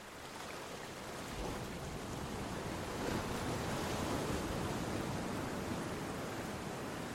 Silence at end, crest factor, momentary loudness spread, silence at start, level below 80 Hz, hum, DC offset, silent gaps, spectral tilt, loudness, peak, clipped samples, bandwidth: 0 s; 18 dB; 7 LU; 0 s; -54 dBFS; none; under 0.1%; none; -4.5 dB/octave; -41 LUFS; -24 dBFS; under 0.1%; 16 kHz